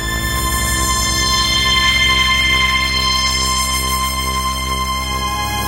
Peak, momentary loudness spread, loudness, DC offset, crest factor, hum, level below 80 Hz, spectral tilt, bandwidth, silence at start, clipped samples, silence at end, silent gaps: -2 dBFS; 7 LU; -14 LUFS; under 0.1%; 14 dB; none; -24 dBFS; -1.5 dB/octave; 17 kHz; 0 s; under 0.1%; 0 s; none